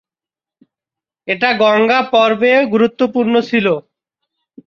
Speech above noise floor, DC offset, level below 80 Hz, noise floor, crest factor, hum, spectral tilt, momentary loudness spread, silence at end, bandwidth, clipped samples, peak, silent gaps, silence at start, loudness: 77 dB; under 0.1%; -62 dBFS; -89 dBFS; 14 dB; none; -6 dB/octave; 7 LU; 0.9 s; 7 kHz; under 0.1%; -2 dBFS; none; 1.25 s; -13 LUFS